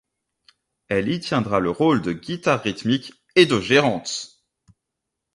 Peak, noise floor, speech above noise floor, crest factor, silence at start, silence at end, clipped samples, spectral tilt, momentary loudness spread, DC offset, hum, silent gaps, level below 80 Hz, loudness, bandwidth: -2 dBFS; -82 dBFS; 61 dB; 22 dB; 0.9 s; 1.1 s; under 0.1%; -5 dB/octave; 10 LU; under 0.1%; none; none; -54 dBFS; -21 LUFS; 11.5 kHz